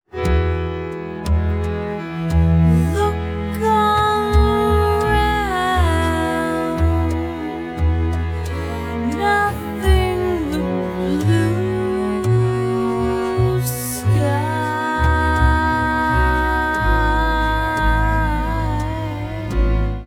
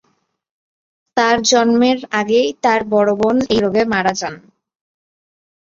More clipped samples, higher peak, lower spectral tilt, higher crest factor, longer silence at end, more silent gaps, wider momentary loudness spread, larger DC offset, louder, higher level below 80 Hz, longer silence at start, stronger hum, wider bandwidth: neither; about the same, -4 dBFS vs -2 dBFS; first, -6.5 dB/octave vs -3.5 dB/octave; about the same, 14 dB vs 16 dB; second, 0 s vs 1.2 s; neither; about the same, 8 LU vs 6 LU; neither; second, -19 LUFS vs -15 LUFS; first, -24 dBFS vs -52 dBFS; second, 0.15 s vs 1.15 s; neither; first, 17.5 kHz vs 7.6 kHz